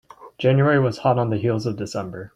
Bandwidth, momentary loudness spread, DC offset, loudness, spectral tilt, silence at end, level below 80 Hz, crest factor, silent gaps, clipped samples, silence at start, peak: 9.6 kHz; 11 LU; under 0.1%; -21 LUFS; -7.5 dB/octave; 0.1 s; -56 dBFS; 16 dB; none; under 0.1%; 0.2 s; -4 dBFS